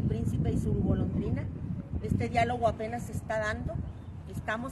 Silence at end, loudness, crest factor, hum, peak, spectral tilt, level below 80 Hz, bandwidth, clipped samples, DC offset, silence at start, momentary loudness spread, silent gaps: 0 s; -32 LUFS; 18 dB; none; -14 dBFS; -7.5 dB/octave; -42 dBFS; 12.5 kHz; under 0.1%; under 0.1%; 0 s; 10 LU; none